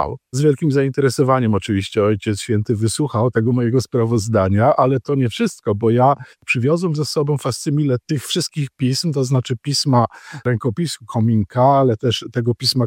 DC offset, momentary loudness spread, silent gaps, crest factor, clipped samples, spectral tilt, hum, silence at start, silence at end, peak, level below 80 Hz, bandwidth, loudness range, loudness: under 0.1%; 7 LU; none; 14 dB; under 0.1%; -6 dB/octave; none; 0 s; 0 s; -4 dBFS; -52 dBFS; 16.5 kHz; 2 LU; -18 LUFS